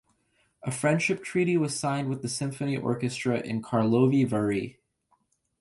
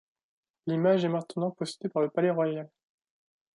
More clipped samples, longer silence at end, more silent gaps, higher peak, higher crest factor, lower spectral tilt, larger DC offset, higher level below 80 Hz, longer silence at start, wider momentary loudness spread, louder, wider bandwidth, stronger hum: neither; about the same, 0.9 s vs 0.9 s; neither; first, -10 dBFS vs -14 dBFS; about the same, 18 dB vs 16 dB; about the same, -6 dB/octave vs -7 dB/octave; neither; first, -64 dBFS vs -80 dBFS; about the same, 0.65 s vs 0.65 s; second, 8 LU vs 12 LU; about the same, -27 LUFS vs -29 LUFS; about the same, 11.5 kHz vs 11.5 kHz; neither